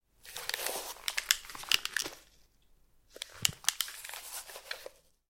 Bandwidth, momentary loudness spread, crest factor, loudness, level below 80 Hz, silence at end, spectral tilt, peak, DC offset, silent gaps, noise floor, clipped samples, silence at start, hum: 17 kHz; 15 LU; 34 dB; -34 LUFS; -66 dBFS; 0.35 s; 1 dB/octave; -4 dBFS; under 0.1%; none; -65 dBFS; under 0.1%; 0.25 s; none